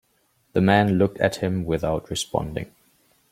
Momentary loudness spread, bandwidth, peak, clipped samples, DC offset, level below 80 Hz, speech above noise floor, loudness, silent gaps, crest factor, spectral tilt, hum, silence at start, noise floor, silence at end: 12 LU; 15.5 kHz; -2 dBFS; under 0.1%; under 0.1%; -48 dBFS; 44 dB; -23 LUFS; none; 20 dB; -6 dB/octave; none; 0.55 s; -66 dBFS; 0.65 s